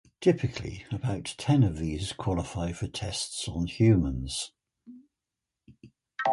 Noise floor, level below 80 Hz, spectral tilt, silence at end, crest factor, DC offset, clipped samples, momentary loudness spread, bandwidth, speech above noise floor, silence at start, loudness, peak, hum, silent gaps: -88 dBFS; -44 dBFS; -6 dB/octave; 0 s; 18 dB; under 0.1%; under 0.1%; 11 LU; 11.5 kHz; 60 dB; 0.2 s; -29 LUFS; -10 dBFS; none; none